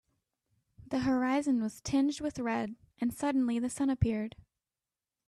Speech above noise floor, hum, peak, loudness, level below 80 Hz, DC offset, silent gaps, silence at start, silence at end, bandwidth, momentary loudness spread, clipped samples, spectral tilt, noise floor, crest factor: over 59 dB; none; -16 dBFS; -32 LUFS; -56 dBFS; under 0.1%; none; 0.8 s; 1 s; 13 kHz; 7 LU; under 0.1%; -6 dB/octave; under -90 dBFS; 18 dB